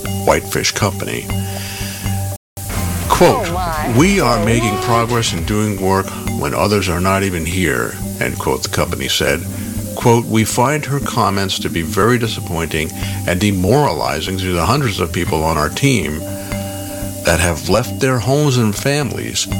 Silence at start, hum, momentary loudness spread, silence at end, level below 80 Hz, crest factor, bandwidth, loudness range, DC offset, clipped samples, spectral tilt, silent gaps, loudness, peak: 0 s; none; 9 LU; 0 s; -32 dBFS; 16 dB; 17.5 kHz; 3 LU; under 0.1%; under 0.1%; -4.5 dB/octave; 2.37-2.56 s; -16 LUFS; 0 dBFS